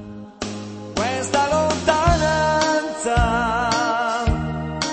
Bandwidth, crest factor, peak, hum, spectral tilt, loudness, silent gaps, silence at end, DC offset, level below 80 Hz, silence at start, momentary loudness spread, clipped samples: 8.8 kHz; 16 dB; -4 dBFS; none; -4.5 dB/octave; -20 LUFS; none; 0 s; under 0.1%; -32 dBFS; 0 s; 12 LU; under 0.1%